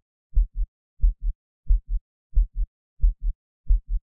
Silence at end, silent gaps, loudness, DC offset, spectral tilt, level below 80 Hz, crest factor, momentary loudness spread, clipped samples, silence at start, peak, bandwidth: 0.05 s; 0.68-0.97 s, 1.35-1.63 s, 2.01-2.30 s, 2.67-2.97 s, 3.35-3.64 s; -30 LUFS; 0.5%; -15 dB/octave; -24 dBFS; 16 dB; 8 LU; under 0.1%; 0.35 s; -8 dBFS; 0.5 kHz